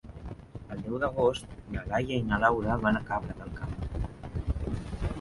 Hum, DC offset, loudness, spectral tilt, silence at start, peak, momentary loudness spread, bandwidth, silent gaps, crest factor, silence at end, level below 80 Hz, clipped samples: none; under 0.1%; -31 LUFS; -7 dB/octave; 0.05 s; -8 dBFS; 14 LU; 11.5 kHz; none; 22 dB; 0 s; -40 dBFS; under 0.1%